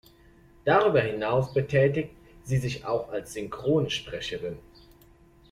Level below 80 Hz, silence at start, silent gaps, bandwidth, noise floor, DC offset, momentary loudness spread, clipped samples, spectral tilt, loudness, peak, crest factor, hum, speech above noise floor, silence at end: -54 dBFS; 0.65 s; none; 15 kHz; -56 dBFS; under 0.1%; 14 LU; under 0.1%; -6 dB/octave; -27 LUFS; -8 dBFS; 20 dB; none; 30 dB; 0.9 s